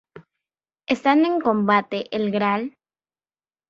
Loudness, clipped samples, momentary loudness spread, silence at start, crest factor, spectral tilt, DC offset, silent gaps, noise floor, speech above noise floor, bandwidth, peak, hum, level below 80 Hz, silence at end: -21 LUFS; under 0.1%; 9 LU; 0.15 s; 20 dB; -6.5 dB/octave; under 0.1%; none; under -90 dBFS; over 70 dB; 7.6 kHz; -4 dBFS; none; -66 dBFS; 1 s